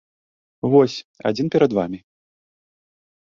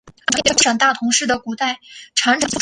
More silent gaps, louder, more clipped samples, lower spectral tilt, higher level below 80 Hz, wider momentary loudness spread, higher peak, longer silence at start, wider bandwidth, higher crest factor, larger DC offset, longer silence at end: first, 1.05-1.14 s vs none; second, -20 LUFS vs -16 LUFS; neither; first, -7 dB/octave vs -1 dB/octave; second, -60 dBFS vs -52 dBFS; first, 12 LU vs 9 LU; about the same, -2 dBFS vs 0 dBFS; first, 0.65 s vs 0.05 s; second, 7.4 kHz vs 11.5 kHz; about the same, 20 dB vs 18 dB; neither; first, 1.25 s vs 0 s